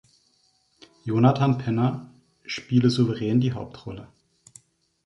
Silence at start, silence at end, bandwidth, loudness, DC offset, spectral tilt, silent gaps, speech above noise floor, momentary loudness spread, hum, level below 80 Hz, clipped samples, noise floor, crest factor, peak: 1.05 s; 1 s; 11 kHz; -23 LUFS; under 0.1%; -7.5 dB/octave; none; 43 dB; 19 LU; none; -58 dBFS; under 0.1%; -66 dBFS; 20 dB; -6 dBFS